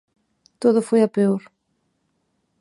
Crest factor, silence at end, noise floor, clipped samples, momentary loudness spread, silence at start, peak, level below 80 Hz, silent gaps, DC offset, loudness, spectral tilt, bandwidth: 18 dB; 1.2 s; -71 dBFS; under 0.1%; 5 LU; 0.6 s; -4 dBFS; -74 dBFS; none; under 0.1%; -20 LUFS; -7.5 dB/octave; 11.5 kHz